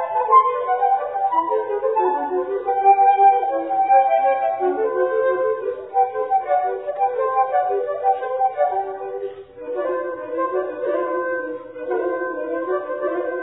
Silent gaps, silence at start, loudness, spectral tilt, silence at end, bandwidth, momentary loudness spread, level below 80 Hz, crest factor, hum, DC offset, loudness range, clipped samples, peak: none; 0 s; -20 LUFS; -8.5 dB/octave; 0 s; 3.9 kHz; 11 LU; -68 dBFS; 16 dB; none; under 0.1%; 7 LU; under 0.1%; -2 dBFS